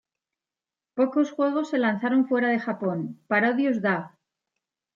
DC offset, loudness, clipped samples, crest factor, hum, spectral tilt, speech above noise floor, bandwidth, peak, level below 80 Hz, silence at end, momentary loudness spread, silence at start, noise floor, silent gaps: under 0.1%; -25 LUFS; under 0.1%; 18 dB; none; -7 dB/octave; over 66 dB; 7.4 kHz; -8 dBFS; -78 dBFS; 0.9 s; 7 LU; 0.95 s; under -90 dBFS; none